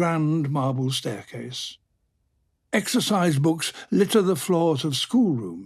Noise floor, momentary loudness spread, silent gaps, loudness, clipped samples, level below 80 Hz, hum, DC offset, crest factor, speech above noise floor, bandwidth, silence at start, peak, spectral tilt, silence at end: -71 dBFS; 12 LU; none; -23 LUFS; under 0.1%; -66 dBFS; none; under 0.1%; 16 dB; 48 dB; 15.5 kHz; 0 s; -8 dBFS; -5.5 dB/octave; 0 s